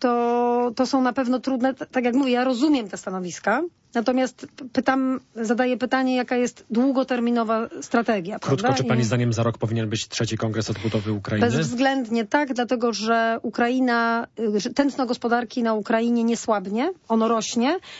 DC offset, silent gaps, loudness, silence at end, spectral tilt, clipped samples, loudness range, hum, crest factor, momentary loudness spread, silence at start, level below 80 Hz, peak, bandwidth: under 0.1%; none; -23 LUFS; 0 s; -5.5 dB/octave; under 0.1%; 2 LU; none; 16 dB; 5 LU; 0 s; -60 dBFS; -6 dBFS; 8 kHz